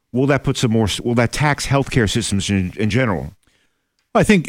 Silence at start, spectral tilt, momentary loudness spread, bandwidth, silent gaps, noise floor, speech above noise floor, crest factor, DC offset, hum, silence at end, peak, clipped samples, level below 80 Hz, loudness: 0.15 s; -5.5 dB/octave; 4 LU; 16 kHz; none; -67 dBFS; 50 dB; 14 dB; under 0.1%; none; 0 s; -4 dBFS; under 0.1%; -38 dBFS; -18 LUFS